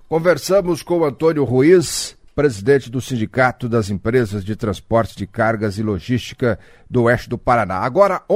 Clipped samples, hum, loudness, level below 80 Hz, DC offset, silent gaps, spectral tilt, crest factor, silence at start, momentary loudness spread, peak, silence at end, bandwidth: under 0.1%; none; -18 LUFS; -42 dBFS; under 0.1%; none; -6 dB/octave; 16 dB; 0.1 s; 8 LU; 0 dBFS; 0 s; 16 kHz